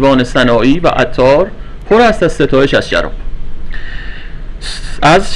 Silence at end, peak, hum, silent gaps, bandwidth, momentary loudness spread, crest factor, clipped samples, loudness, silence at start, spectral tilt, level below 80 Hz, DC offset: 0 s; 0 dBFS; none; none; 10.5 kHz; 19 LU; 10 dB; under 0.1%; -10 LUFS; 0 s; -5.5 dB/octave; -22 dBFS; under 0.1%